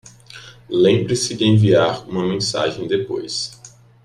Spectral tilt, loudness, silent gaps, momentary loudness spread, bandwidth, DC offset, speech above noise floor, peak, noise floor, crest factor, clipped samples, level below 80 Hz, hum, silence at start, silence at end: -5.5 dB/octave; -18 LUFS; none; 14 LU; 12 kHz; under 0.1%; 24 dB; -4 dBFS; -41 dBFS; 16 dB; under 0.1%; -54 dBFS; none; 0.3 s; 0.35 s